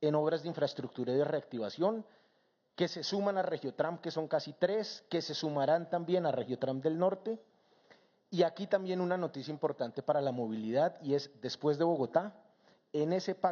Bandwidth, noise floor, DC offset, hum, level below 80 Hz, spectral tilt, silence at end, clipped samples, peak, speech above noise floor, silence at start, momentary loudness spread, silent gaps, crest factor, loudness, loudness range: 7 kHz; -74 dBFS; under 0.1%; none; under -90 dBFS; -5 dB/octave; 0 s; under 0.1%; -14 dBFS; 41 dB; 0 s; 7 LU; none; 20 dB; -34 LUFS; 2 LU